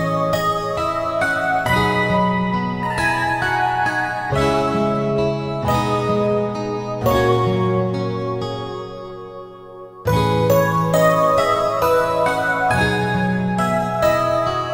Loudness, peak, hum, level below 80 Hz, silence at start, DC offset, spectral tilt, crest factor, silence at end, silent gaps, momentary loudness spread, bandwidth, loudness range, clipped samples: -18 LUFS; -2 dBFS; none; -40 dBFS; 0 s; under 0.1%; -6 dB/octave; 16 dB; 0 s; none; 9 LU; 16.5 kHz; 4 LU; under 0.1%